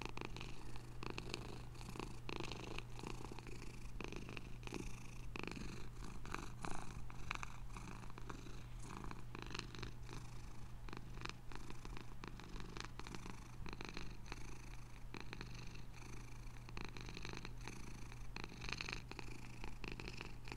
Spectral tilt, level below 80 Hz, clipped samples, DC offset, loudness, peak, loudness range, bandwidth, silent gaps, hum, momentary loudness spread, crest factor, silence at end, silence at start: -4.5 dB/octave; -54 dBFS; under 0.1%; under 0.1%; -52 LUFS; -20 dBFS; 3 LU; 16 kHz; none; none; 7 LU; 26 dB; 0 s; 0 s